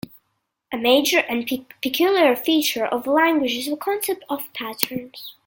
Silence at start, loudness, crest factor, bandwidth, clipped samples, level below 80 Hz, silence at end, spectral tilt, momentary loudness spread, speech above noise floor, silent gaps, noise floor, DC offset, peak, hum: 0.7 s; -20 LUFS; 22 dB; 17 kHz; under 0.1%; -64 dBFS; 0.15 s; -2.5 dB/octave; 12 LU; 53 dB; none; -74 dBFS; under 0.1%; 0 dBFS; none